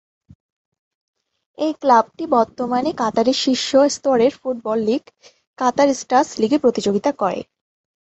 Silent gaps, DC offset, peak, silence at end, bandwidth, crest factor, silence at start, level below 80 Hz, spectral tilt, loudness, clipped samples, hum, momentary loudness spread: 5.47-5.54 s; under 0.1%; -2 dBFS; 0.65 s; 8.2 kHz; 18 dB; 1.6 s; -60 dBFS; -4 dB/octave; -18 LUFS; under 0.1%; none; 7 LU